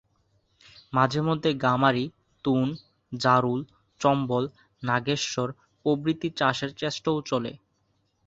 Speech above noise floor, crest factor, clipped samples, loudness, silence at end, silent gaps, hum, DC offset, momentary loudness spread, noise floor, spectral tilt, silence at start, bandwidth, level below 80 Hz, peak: 46 dB; 22 dB; under 0.1%; -26 LUFS; 0.7 s; none; none; under 0.1%; 12 LU; -71 dBFS; -5.5 dB/octave; 0.9 s; 8 kHz; -62 dBFS; -6 dBFS